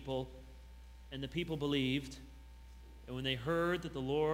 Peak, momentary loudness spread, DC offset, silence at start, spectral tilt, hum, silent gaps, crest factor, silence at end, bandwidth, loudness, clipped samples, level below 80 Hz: -20 dBFS; 22 LU; under 0.1%; 0 s; -6 dB/octave; none; none; 18 dB; 0 s; 16 kHz; -37 LUFS; under 0.1%; -54 dBFS